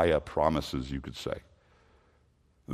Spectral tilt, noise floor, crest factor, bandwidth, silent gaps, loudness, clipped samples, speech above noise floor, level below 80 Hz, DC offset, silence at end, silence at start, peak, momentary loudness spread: -6 dB/octave; -67 dBFS; 22 dB; 14.5 kHz; none; -32 LUFS; under 0.1%; 37 dB; -48 dBFS; under 0.1%; 0 s; 0 s; -10 dBFS; 11 LU